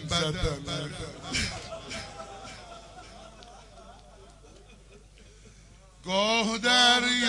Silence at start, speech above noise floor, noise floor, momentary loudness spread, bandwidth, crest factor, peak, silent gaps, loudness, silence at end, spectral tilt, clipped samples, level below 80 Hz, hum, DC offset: 0 s; 26 dB; -53 dBFS; 27 LU; 11.5 kHz; 22 dB; -8 dBFS; none; -26 LUFS; 0 s; -2.5 dB/octave; under 0.1%; -48 dBFS; none; under 0.1%